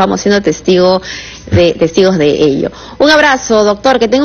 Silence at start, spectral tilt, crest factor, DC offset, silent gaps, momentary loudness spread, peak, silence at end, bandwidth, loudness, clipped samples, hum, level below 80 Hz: 0 s; -5 dB/octave; 10 dB; under 0.1%; none; 8 LU; 0 dBFS; 0 s; 9.2 kHz; -10 LUFS; 0.3%; none; -36 dBFS